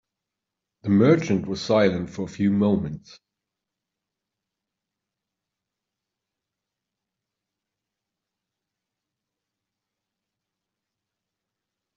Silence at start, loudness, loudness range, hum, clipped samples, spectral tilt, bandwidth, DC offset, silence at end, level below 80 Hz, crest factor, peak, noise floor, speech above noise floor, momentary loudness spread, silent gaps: 0.85 s; -22 LUFS; 8 LU; none; under 0.1%; -6.5 dB/octave; 7.6 kHz; under 0.1%; 9 s; -62 dBFS; 24 dB; -4 dBFS; -86 dBFS; 64 dB; 15 LU; none